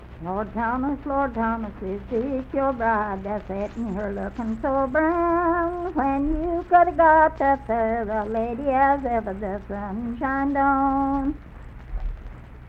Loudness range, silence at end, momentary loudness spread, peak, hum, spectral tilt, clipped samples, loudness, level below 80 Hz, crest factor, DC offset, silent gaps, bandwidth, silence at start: 6 LU; 0 s; 13 LU; -6 dBFS; none; -9 dB/octave; under 0.1%; -23 LUFS; -38 dBFS; 18 dB; under 0.1%; none; 6.4 kHz; 0 s